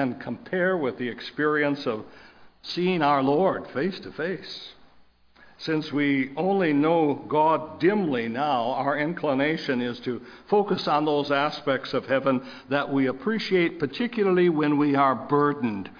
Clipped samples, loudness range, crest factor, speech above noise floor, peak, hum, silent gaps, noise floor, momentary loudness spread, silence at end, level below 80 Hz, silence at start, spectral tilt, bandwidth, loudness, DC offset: under 0.1%; 3 LU; 16 dB; 31 dB; -8 dBFS; none; none; -56 dBFS; 10 LU; 0 s; -66 dBFS; 0 s; -7.5 dB/octave; 5.2 kHz; -25 LUFS; under 0.1%